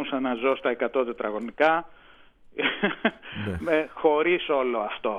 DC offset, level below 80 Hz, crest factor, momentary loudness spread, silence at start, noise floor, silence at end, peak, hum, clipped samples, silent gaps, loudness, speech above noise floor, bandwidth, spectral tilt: under 0.1%; -54 dBFS; 18 dB; 8 LU; 0 s; -52 dBFS; 0 s; -8 dBFS; none; under 0.1%; none; -26 LUFS; 27 dB; 10 kHz; -7 dB/octave